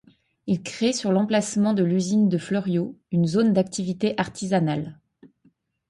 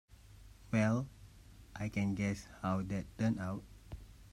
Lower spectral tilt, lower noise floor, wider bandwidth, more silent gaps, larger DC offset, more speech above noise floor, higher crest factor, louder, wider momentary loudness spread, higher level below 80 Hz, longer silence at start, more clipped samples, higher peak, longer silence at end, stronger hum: about the same, -6 dB/octave vs -7 dB/octave; first, -63 dBFS vs -57 dBFS; second, 11.5 kHz vs 13.5 kHz; neither; neither; first, 41 dB vs 22 dB; about the same, 16 dB vs 18 dB; first, -23 LUFS vs -37 LUFS; second, 7 LU vs 20 LU; about the same, -62 dBFS vs -58 dBFS; first, 0.45 s vs 0.1 s; neither; first, -8 dBFS vs -20 dBFS; first, 0.95 s vs 0.05 s; neither